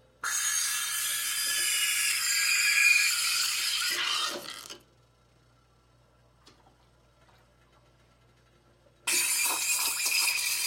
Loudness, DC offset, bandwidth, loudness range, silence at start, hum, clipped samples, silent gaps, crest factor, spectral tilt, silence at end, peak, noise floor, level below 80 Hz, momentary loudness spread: -25 LUFS; under 0.1%; 16.5 kHz; 11 LU; 0.25 s; none; under 0.1%; none; 20 dB; 3 dB/octave; 0 s; -12 dBFS; -63 dBFS; -70 dBFS; 10 LU